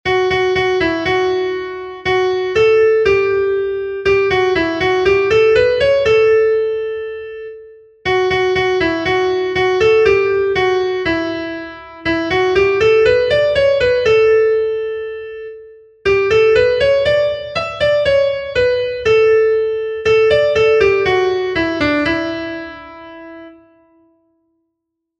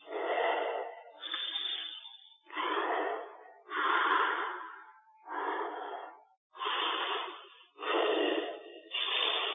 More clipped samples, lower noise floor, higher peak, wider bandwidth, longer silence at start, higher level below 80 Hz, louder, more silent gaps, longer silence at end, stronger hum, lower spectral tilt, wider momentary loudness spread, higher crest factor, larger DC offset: neither; first, -75 dBFS vs -56 dBFS; first, -2 dBFS vs -16 dBFS; first, 8 kHz vs 4.4 kHz; about the same, 0.05 s vs 0 s; first, -42 dBFS vs under -90 dBFS; first, -14 LUFS vs -33 LUFS; second, none vs 6.37-6.50 s; first, 1.7 s vs 0 s; neither; first, -5.5 dB/octave vs -3 dB/octave; second, 13 LU vs 18 LU; second, 14 dB vs 20 dB; neither